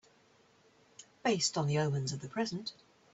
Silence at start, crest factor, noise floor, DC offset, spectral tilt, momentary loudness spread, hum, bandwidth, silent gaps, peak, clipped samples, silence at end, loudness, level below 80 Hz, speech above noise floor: 1 s; 18 dB; -66 dBFS; under 0.1%; -4.5 dB/octave; 15 LU; none; 8.4 kHz; none; -18 dBFS; under 0.1%; 0.4 s; -34 LUFS; -72 dBFS; 33 dB